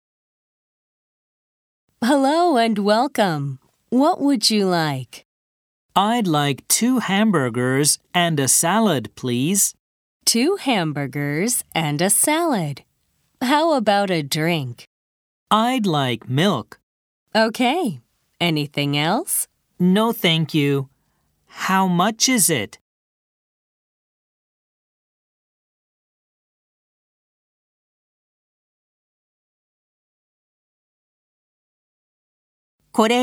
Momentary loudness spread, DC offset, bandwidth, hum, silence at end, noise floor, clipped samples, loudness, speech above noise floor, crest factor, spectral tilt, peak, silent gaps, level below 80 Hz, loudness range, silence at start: 9 LU; under 0.1%; over 20 kHz; none; 0 s; -67 dBFS; under 0.1%; -19 LUFS; 49 dB; 20 dB; -3.5 dB/octave; -2 dBFS; 5.25-5.89 s, 9.79-10.20 s, 14.87-15.46 s, 16.83-17.26 s, 22.81-32.78 s; -68 dBFS; 4 LU; 2 s